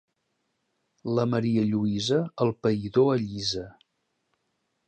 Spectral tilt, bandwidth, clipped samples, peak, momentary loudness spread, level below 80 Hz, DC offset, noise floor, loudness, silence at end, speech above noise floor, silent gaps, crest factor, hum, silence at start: -6.5 dB/octave; 9.2 kHz; under 0.1%; -10 dBFS; 7 LU; -60 dBFS; under 0.1%; -77 dBFS; -26 LUFS; 1.15 s; 52 dB; none; 18 dB; none; 1.05 s